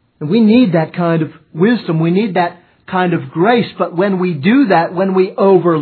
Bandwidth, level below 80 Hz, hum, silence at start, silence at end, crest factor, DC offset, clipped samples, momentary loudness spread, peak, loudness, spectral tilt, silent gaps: 4.6 kHz; -62 dBFS; none; 0.2 s; 0 s; 12 dB; under 0.1%; under 0.1%; 7 LU; 0 dBFS; -13 LUFS; -11 dB/octave; none